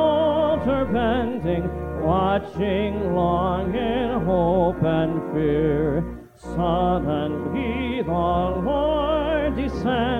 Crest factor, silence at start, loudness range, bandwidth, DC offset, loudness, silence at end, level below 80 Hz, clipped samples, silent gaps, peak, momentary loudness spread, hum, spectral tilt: 14 dB; 0 s; 2 LU; 9.2 kHz; under 0.1%; -22 LUFS; 0 s; -36 dBFS; under 0.1%; none; -8 dBFS; 5 LU; 60 Hz at -45 dBFS; -8.5 dB/octave